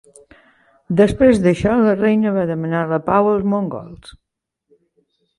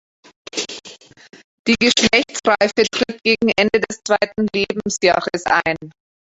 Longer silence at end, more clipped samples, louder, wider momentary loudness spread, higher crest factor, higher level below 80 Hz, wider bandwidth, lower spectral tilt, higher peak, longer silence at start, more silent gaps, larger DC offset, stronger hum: first, 1.45 s vs 0.4 s; neither; about the same, -16 LUFS vs -17 LUFS; second, 9 LU vs 12 LU; about the same, 16 dB vs 18 dB; first, -44 dBFS vs -52 dBFS; first, 11.5 kHz vs 8.2 kHz; first, -8 dB/octave vs -3 dB/octave; about the same, -2 dBFS vs 0 dBFS; first, 0.9 s vs 0.55 s; second, none vs 1.44-1.65 s; neither; neither